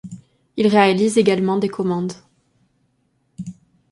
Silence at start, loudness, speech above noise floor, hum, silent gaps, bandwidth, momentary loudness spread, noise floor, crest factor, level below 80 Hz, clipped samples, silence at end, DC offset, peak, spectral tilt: 0.05 s; -18 LUFS; 49 dB; none; none; 11.5 kHz; 21 LU; -65 dBFS; 18 dB; -60 dBFS; under 0.1%; 0.4 s; under 0.1%; -4 dBFS; -6 dB/octave